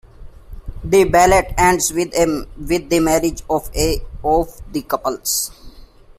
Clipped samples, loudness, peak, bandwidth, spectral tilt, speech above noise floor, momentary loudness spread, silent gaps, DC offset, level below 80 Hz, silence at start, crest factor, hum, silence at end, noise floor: under 0.1%; -17 LUFS; -2 dBFS; 16 kHz; -4 dB/octave; 24 dB; 13 LU; none; under 0.1%; -32 dBFS; 0.05 s; 16 dB; none; 0.35 s; -41 dBFS